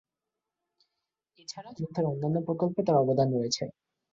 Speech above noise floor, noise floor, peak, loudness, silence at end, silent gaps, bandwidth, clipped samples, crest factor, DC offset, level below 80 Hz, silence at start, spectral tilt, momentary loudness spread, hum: 60 dB; -88 dBFS; -12 dBFS; -28 LUFS; 0.4 s; none; 7.8 kHz; under 0.1%; 18 dB; under 0.1%; -68 dBFS; 1.5 s; -6.5 dB/octave; 17 LU; none